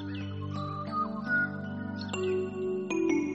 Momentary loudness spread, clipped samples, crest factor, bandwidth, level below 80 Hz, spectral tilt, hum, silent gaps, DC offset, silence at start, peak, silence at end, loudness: 8 LU; under 0.1%; 16 dB; 8.2 kHz; -68 dBFS; -6 dB/octave; 50 Hz at -65 dBFS; none; under 0.1%; 0 s; -16 dBFS; 0 s; -32 LUFS